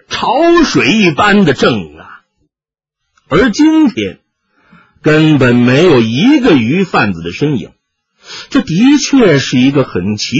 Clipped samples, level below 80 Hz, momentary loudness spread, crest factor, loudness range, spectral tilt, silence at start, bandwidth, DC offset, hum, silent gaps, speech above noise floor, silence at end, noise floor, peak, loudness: under 0.1%; -40 dBFS; 9 LU; 10 dB; 4 LU; -5.5 dB/octave; 0.1 s; 8 kHz; under 0.1%; none; none; 78 dB; 0 s; -87 dBFS; 0 dBFS; -10 LUFS